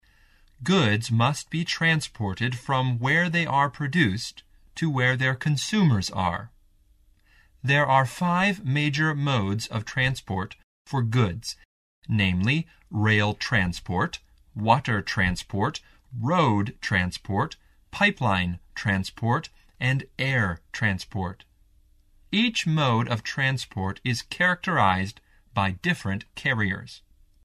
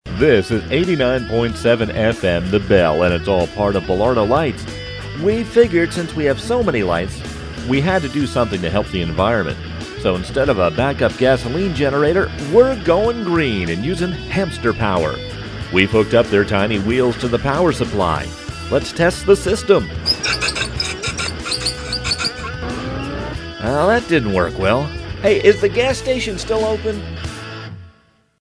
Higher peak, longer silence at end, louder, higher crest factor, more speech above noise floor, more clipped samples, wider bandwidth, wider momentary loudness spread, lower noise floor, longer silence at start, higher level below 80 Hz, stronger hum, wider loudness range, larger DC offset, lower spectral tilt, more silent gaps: second, -6 dBFS vs 0 dBFS; about the same, 0.5 s vs 0.5 s; second, -25 LUFS vs -17 LUFS; about the same, 20 dB vs 18 dB; about the same, 35 dB vs 38 dB; neither; first, 14 kHz vs 11 kHz; about the same, 10 LU vs 11 LU; first, -59 dBFS vs -54 dBFS; first, 0.6 s vs 0.05 s; second, -50 dBFS vs -34 dBFS; neither; about the same, 3 LU vs 3 LU; neither; about the same, -5.5 dB/octave vs -5.5 dB/octave; first, 10.63-10.85 s, 11.65-12.02 s vs none